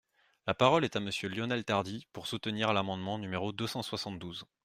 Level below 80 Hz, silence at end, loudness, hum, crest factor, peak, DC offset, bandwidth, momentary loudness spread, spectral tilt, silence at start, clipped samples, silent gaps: -68 dBFS; 0.2 s; -33 LUFS; none; 24 dB; -10 dBFS; under 0.1%; 15.5 kHz; 14 LU; -5 dB/octave; 0.45 s; under 0.1%; none